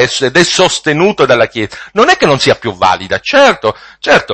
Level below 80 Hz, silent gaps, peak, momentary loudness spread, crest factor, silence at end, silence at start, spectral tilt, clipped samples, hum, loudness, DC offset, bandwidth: -44 dBFS; none; 0 dBFS; 8 LU; 10 dB; 0 s; 0 s; -3.5 dB/octave; 0.4%; none; -10 LUFS; under 0.1%; 11 kHz